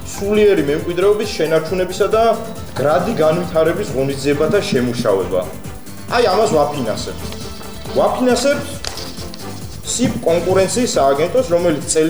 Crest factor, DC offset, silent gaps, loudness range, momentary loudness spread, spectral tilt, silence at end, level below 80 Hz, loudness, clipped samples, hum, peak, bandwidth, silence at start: 14 dB; 2%; none; 3 LU; 14 LU; -4.5 dB/octave; 0 s; -40 dBFS; -16 LUFS; under 0.1%; none; -4 dBFS; over 20 kHz; 0 s